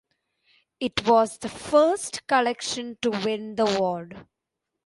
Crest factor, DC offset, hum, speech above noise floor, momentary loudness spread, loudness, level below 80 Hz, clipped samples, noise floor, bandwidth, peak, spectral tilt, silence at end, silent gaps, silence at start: 18 dB; under 0.1%; none; 59 dB; 11 LU; -24 LUFS; -60 dBFS; under 0.1%; -83 dBFS; 11.5 kHz; -6 dBFS; -3.5 dB/octave; 0.65 s; none; 0.8 s